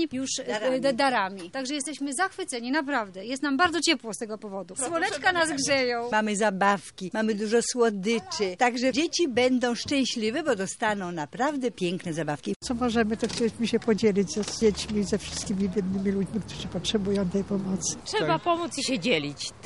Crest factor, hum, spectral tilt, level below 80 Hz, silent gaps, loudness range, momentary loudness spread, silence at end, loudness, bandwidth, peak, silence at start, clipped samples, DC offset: 18 dB; none; -4 dB/octave; -54 dBFS; 12.56-12.60 s; 3 LU; 8 LU; 0 s; -27 LUFS; 11.5 kHz; -8 dBFS; 0 s; under 0.1%; under 0.1%